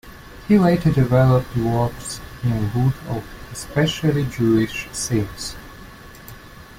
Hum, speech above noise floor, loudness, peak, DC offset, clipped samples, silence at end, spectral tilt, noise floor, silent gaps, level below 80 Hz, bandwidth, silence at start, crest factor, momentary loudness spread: none; 21 dB; -20 LUFS; -4 dBFS; under 0.1%; under 0.1%; 0 s; -6.5 dB/octave; -40 dBFS; none; -40 dBFS; 16 kHz; 0.05 s; 16 dB; 24 LU